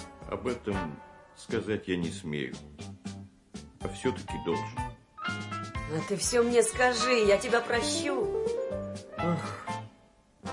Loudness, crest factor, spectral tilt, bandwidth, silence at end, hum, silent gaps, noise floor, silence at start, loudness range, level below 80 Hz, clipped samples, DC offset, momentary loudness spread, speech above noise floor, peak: -30 LUFS; 20 dB; -4 dB/octave; 11.5 kHz; 0 s; none; none; -61 dBFS; 0 s; 10 LU; -52 dBFS; under 0.1%; under 0.1%; 19 LU; 31 dB; -10 dBFS